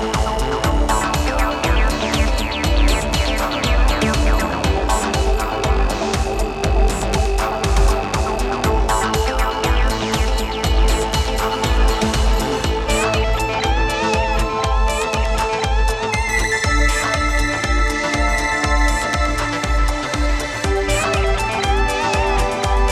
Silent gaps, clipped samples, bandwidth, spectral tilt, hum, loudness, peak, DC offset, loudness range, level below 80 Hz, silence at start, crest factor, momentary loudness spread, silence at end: none; under 0.1%; 14.5 kHz; -4.5 dB/octave; none; -18 LUFS; -4 dBFS; under 0.1%; 1 LU; -20 dBFS; 0 s; 14 dB; 3 LU; 0 s